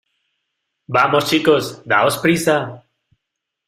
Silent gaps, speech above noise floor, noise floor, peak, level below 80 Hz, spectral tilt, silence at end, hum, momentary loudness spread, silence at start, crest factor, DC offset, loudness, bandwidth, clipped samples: none; 64 dB; -80 dBFS; 0 dBFS; -58 dBFS; -4.5 dB/octave; 0.9 s; none; 6 LU; 0.9 s; 18 dB; under 0.1%; -16 LUFS; 16 kHz; under 0.1%